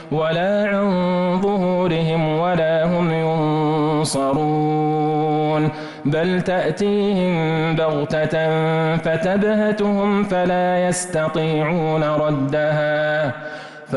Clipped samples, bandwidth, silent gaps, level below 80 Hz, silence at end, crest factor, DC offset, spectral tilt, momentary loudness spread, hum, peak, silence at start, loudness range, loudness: under 0.1%; 11.5 kHz; none; -50 dBFS; 0 s; 8 dB; under 0.1%; -6.5 dB/octave; 2 LU; none; -10 dBFS; 0 s; 1 LU; -19 LUFS